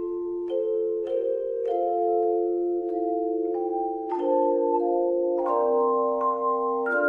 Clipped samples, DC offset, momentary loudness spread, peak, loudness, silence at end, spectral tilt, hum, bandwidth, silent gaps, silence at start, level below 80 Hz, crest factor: under 0.1%; under 0.1%; 5 LU; -12 dBFS; -25 LUFS; 0 s; -7.5 dB/octave; none; 3.4 kHz; none; 0 s; -66 dBFS; 12 dB